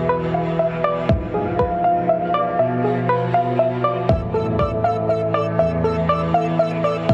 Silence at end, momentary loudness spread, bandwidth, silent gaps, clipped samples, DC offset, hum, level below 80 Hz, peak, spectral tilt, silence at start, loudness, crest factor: 0 s; 2 LU; 7.6 kHz; none; under 0.1%; under 0.1%; none; -36 dBFS; -4 dBFS; -9 dB/octave; 0 s; -20 LUFS; 16 dB